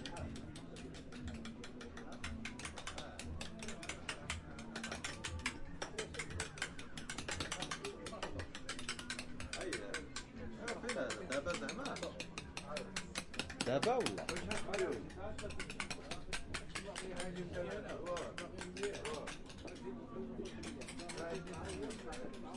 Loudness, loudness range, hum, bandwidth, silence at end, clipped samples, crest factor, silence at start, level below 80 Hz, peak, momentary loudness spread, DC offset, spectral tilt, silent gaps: -44 LUFS; 6 LU; none; 11.5 kHz; 0 s; under 0.1%; 24 dB; 0 s; -58 dBFS; -20 dBFS; 8 LU; under 0.1%; -3.5 dB/octave; none